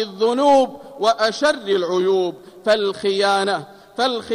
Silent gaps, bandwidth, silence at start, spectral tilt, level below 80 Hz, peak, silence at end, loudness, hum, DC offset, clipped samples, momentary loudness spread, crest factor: none; 14.5 kHz; 0 s; -4 dB/octave; -62 dBFS; -6 dBFS; 0 s; -19 LUFS; none; under 0.1%; under 0.1%; 10 LU; 14 dB